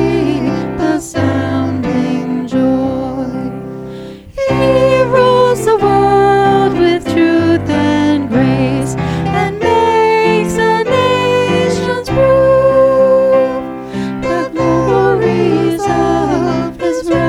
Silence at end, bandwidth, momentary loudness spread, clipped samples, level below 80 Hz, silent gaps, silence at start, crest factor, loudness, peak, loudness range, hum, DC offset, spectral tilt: 0 s; 14 kHz; 9 LU; under 0.1%; -36 dBFS; none; 0 s; 10 dB; -12 LUFS; 0 dBFS; 5 LU; none; under 0.1%; -6.5 dB/octave